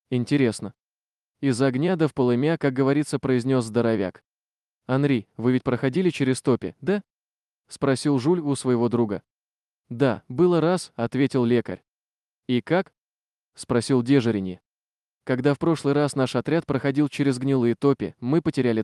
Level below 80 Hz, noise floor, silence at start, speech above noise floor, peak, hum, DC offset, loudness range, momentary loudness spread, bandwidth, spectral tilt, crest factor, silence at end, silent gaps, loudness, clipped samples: -62 dBFS; under -90 dBFS; 0.1 s; over 68 dB; -8 dBFS; none; under 0.1%; 3 LU; 7 LU; 12 kHz; -7 dB/octave; 16 dB; 0 s; 0.80-0.86 s, 7.10-7.16 s, 12.98-13.04 s; -23 LUFS; under 0.1%